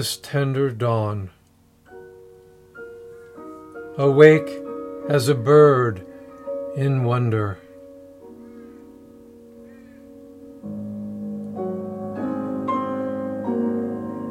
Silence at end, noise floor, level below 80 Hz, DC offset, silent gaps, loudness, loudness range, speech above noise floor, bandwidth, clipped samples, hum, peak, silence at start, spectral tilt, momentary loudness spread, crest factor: 0 s; -56 dBFS; -64 dBFS; under 0.1%; none; -21 LUFS; 17 LU; 39 dB; 15.5 kHz; under 0.1%; none; 0 dBFS; 0 s; -6.5 dB/octave; 27 LU; 22 dB